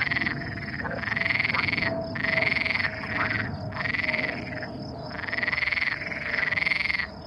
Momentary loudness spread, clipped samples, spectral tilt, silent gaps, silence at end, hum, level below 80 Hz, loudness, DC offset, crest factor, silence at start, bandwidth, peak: 10 LU; under 0.1%; -5.5 dB/octave; none; 0 s; none; -50 dBFS; -26 LUFS; under 0.1%; 18 dB; 0 s; 11 kHz; -10 dBFS